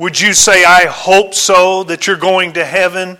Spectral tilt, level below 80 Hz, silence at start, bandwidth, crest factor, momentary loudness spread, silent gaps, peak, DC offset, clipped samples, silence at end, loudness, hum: -1.5 dB/octave; -44 dBFS; 0 s; over 20 kHz; 10 dB; 8 LU; none; 0 dBFS; under 0.1%; 0.3%; 0.05 s; -9 LUFS; none